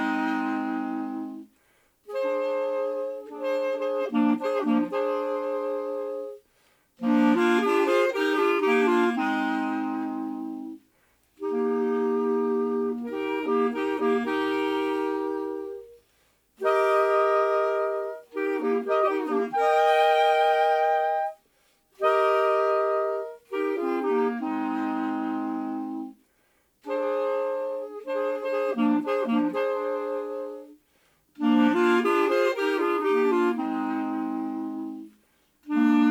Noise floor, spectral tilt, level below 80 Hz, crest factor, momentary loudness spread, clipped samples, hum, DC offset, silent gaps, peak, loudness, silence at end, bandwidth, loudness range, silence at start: -67 dBFS; -5.5 dB/octave; -74 dBFS; 16 dB; 12 LU; under 0.1%; none; under 0.1%; none; -10 dBFS; -26 LUFS; 0 s; 17 kHz; 6 LU; 0 s